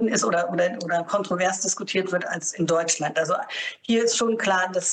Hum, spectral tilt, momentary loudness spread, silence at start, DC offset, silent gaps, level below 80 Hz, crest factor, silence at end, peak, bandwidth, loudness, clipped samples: none; -3 dB/octave; 5 LU; 0 s; under 0.1%; none; -72 dBFS; 14 dB; 0 s; -10 dBFS; 10 kHz; -24 LUFS; under 0.1%